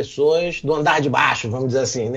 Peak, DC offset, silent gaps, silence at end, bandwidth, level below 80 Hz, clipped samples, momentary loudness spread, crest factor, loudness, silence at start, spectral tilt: -2 dBFS; under 0.1%; none; 0 s; 8.2 kHz; -50 dBFS; under 0.1%; 5 LU; 16 dB; -19 LUFS; 0 s; -4.5 dB/octave